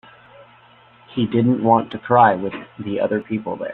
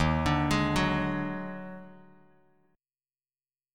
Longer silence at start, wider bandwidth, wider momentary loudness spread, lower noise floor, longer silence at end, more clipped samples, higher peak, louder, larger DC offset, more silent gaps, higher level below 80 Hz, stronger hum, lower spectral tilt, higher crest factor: first, 0.4 s vs 0 s; second, 4.2 kHz vs 16 kHz; second, 14 LU vs 17 LU; second, -50 dBFS vs under -90 dBFS; second, 0 s vs 1.75 s; neither; first, -2 dBFS vs -12 dBFS; first, -19 LUFS vs -29 LUFS; neither; neither; second, -58 dBFS vs -44 dBFS; neither; first, -10.5 dB/octave vs -6 dB/octave; about the same, 18 dB vs 18 dB